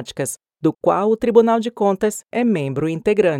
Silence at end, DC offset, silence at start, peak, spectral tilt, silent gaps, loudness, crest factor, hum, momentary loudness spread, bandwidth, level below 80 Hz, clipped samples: 0 s; under 0.1%; 0 s; 0 dBFS; -6 dB/octave; none; -19 LUFS; 18 dB; none; 8 LU; 15.5 kHz; -54 dBFS; under 0.1%